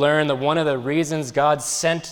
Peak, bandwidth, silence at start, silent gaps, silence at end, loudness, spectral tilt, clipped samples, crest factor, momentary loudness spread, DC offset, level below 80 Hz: -6 dBFS; 19.5 kHz; 0 s; none; 0 s; -21 LUFS; -4 dB/octave; under 0.1%; 14 dB; 3 LU; under 0.1%; -60 dBFS